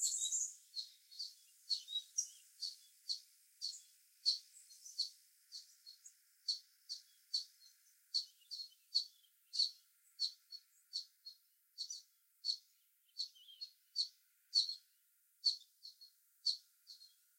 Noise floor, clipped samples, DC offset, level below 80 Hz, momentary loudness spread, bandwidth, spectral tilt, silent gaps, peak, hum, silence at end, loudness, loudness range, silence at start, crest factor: -76 dBFS; under 0.1%; under 0.1%; under -90 dBFS; 20 LU; 16.5 kHz; 9.5 dB/octave; none; -22 dBFS; none; 0.3 s; -42 LUFS; 5 LU; 0 s; 26 dB